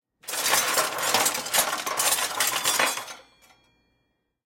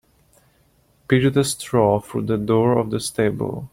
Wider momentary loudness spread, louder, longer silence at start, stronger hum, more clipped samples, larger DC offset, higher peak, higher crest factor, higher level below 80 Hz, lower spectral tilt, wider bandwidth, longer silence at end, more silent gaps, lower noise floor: about the same, 5 LU vs 6 LU; second, -23 LUFS vs -20 LUFS; second, 0.25 s vs 1.1 s; neither; neither; neither; second, -8 dBFS vs -2 dBFS; about the same, 20 dB vs 18 dB; second, -66 dBFS vs -52 dBFS; second, 1 dB/octave vs -6 dB/octave; about the same, 17 kHz vs 16.5 kHz; first, 1.25 s vs 0.05 s; neither; first, -74 dBFS vs -59 dBFS